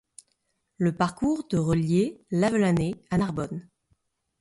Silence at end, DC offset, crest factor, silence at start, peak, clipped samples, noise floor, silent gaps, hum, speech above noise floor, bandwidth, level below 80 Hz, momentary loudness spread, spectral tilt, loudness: 0.8 s; under 0.1%; 18 dB; 0.8 s; -10 dBFS; under 0.1%; -75 dBFS; none; none; 50 dB; 11.5 kHz; -52 dBFS; 6 LU; -7 dB/octave; -26 LUFS